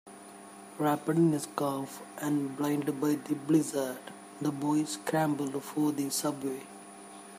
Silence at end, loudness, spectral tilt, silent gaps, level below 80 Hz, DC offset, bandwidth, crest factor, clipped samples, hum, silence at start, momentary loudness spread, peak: 0 s; -31 LUFS; -5.5 dB/octave; none; -78 dBFS; under 0.1%; 15.5 kHz; 20 dB; under 0.1%; none; 0.05 s; 20 LU; -12 dBFS